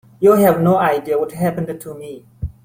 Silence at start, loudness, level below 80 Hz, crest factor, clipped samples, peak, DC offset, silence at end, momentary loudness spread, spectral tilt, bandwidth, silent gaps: 0.2 s; -16 LUFS; -42 dBFS; 16 dB; under 0.1%; -2 dBFS; under 0.1%; 0.15 s; 19 LU; -7.5 dB/octave; 16.5 kHz; none